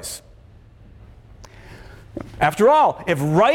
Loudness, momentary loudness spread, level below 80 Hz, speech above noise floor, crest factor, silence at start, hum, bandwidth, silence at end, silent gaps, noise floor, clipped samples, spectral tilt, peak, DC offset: -17 LUFS; 22 LU; -46 dBFS; 30 dB; 16 dB; 0 s; none; 17.5 kHz; 0 s; none; -47 dBFS; under 0.1%; -5.5 dB/octave; -4 dBFS; under 0.1%